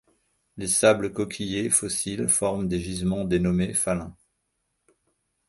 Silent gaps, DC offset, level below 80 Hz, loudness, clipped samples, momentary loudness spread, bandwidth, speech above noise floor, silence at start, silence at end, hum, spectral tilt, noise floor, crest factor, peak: none; under 0.1%; -48 dBFS; -24 LUFS; under 0.1%; 9 LU; 12 kHz; 52 dB; 0.55 s; 1.35 s; none; -4 dB/octave; -76 dBFS; 22 dB; -4 dBFS